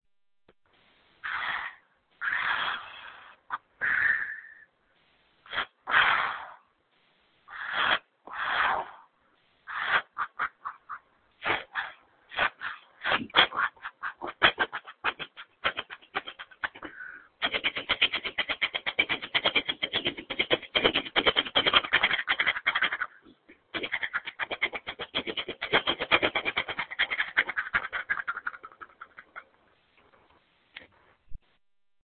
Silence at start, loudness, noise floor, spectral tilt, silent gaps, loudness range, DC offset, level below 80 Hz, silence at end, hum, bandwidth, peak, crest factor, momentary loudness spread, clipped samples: 1.25 s; -28 LUFS; -72 dBFS; -6 dB/octave; none; 8 LU; under 0.1%; -60 dBFS; 0.8 s; none; 4.7 kHz; -4 dBFS; 28 dB; 18 LU; under 0.1%